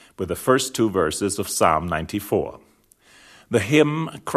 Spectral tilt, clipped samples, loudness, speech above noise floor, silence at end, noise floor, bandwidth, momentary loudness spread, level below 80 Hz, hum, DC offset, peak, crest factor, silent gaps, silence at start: -4.5 dB/octave; under 0.1%; -21 LUFS; 34 dB; 0 s; -56 dBFS; 14 kHz; 8 LU; -48 dBFS; none; under 0.1%; -4 dBFS; 20 dB; none; 0.2 s